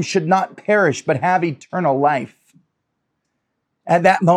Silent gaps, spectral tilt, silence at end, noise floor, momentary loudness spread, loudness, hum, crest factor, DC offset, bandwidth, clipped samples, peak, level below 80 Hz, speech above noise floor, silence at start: none; -6 dB/octave; 0 s; -74 dBFS; 8 LU; -18 LUFS; none; 18 dB; under 0.1%; 11.5 kHz; under 0.1%; -2 dBFS; -66 dBFS; 57 dB; 0 s